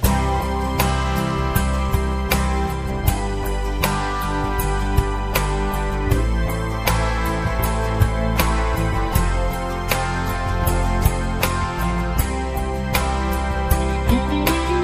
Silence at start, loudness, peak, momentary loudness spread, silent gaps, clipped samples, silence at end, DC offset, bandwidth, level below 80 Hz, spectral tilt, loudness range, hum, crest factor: 0 s; -21 LUFS; -2 dBFS; 4 LU; none; under 0.1%; 0 s; 0.3%; 15.5 kHz; -24 dBFS; -5.5 dB/octave; 1 LU; none; 18 dB